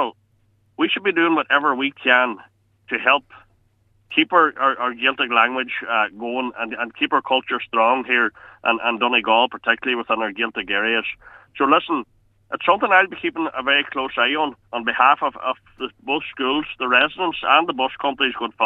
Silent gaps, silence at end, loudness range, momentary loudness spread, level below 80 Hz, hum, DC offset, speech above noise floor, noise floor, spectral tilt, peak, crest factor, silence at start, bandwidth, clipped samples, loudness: none; 0 s; 2 LU; 9 LU; -62 dBFS; none; under 0.1%; 41 dB; -61 dBFS; -5.5 dB/octave; 0 dBFS; 20 dB; 0 s; 7.2 kHz; under 0.1%; -19 LUFS